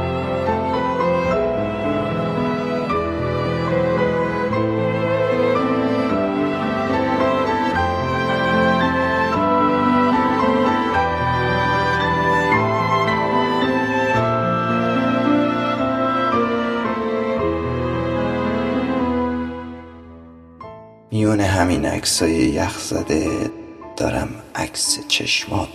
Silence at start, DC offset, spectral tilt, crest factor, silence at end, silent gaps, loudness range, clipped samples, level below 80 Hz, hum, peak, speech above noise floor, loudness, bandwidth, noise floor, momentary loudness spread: 0 s; under 0.1%; -5 dB/octave; 16 dB; 0 s; none; 4 LU; under 0.1%; -40 dBFS; none; -2 dBFS; 21 dB; -19 LUFS; 14 kHz; -41 dBFS; 5 LU